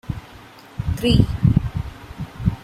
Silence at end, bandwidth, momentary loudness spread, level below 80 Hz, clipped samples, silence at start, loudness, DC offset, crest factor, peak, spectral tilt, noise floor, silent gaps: 0 s; 15.5 kHz; 17 LU; -32 dBFS; under 0.1%; 0.1 s; -20 LUFS; under 0.1%; 20 dB; -2 dBFS; -7.5 dB/octave; -43 dBFS; none